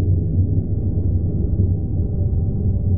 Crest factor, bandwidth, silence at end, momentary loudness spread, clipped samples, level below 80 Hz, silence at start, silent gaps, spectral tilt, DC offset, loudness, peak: 12 dB; 1 kHz; 0 s; 2 LU; under 0.1%; -26 dBFS; 0 s; none; -17.5 dB/octave; 3%; -21 LUFS; -6 dBFS